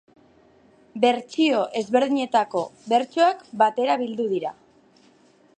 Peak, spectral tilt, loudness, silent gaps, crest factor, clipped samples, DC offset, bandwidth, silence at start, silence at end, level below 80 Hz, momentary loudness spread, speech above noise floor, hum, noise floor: -4 dBFS; -4.5 dB/octave; -22 LUFS; none; 20 dB; under 0.1%; under 0.1%; 9.4 kHz; 0.95 s; 1.05 s; -74 dBFS; 7 LU; 35 dB; none; -57 dBFS